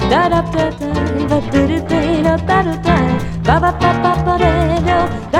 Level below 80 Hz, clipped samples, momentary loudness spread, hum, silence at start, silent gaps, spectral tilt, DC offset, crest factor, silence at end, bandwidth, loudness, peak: -26 dBFS; under 0.1%; 4 LU; none; 0 s; none; -7 dB/octave; under 0.1%; 14 dB; 0 s; 12.5 kHz; -15 LUFS; 0 dBFS